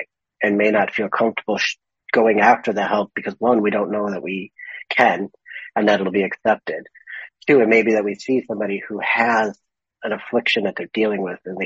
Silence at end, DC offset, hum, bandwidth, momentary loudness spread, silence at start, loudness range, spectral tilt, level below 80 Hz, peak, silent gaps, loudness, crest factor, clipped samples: 0 s; under 0.1%; none; 7.8 kHz; 14 LU; 0 s; 2 LU; -3 dB/octave; -66 dBFS; 0 dBFS; none; -19 LUFS; 20 dB; under 0.1%